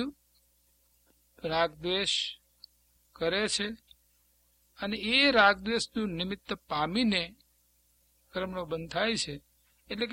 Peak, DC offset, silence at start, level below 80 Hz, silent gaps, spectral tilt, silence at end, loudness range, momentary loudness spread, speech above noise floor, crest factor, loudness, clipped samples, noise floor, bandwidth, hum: -8 dBFS; under 0.1%; 0 s; -60 dBFS; none; -3.5 dB/octave; 0 s; 6 LU; 16 LU; 39 dB; 24 dB; -29 LUFS; under 0.1%; -69 dBFS; 16.5 kHz; 60 Hz at -60 dBFS